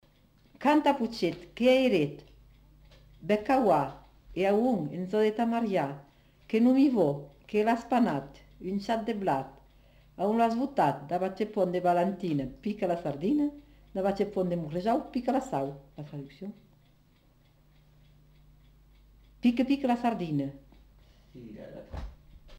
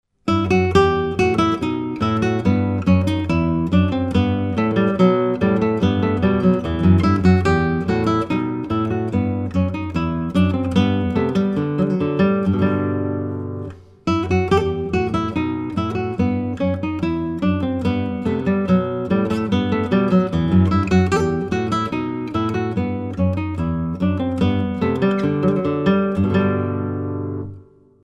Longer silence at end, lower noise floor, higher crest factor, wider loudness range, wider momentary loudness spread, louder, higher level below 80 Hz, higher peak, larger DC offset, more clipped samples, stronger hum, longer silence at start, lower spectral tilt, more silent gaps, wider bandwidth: second, 0 s vs 0.4 s; first, -63 dBFS vs -44 dBFS; about the same, 18 dB vs 18 dB; first, 7 LU vs 4 LU; first, 19 LU vs 7 LU; second, -29 LUFS vs -19 LUFS; second, -56 dBFS vs -40 dBFS; second, -12 dBFS vs 0 dBFS; neither; neither; first, 50 Hz at -60 dBFS vs none; first, 0.6 s vs 0.25 s; about the same, -7 dB/octave vs -8 dB/octave; neither; first, 16 kHz vs 9.2 kHz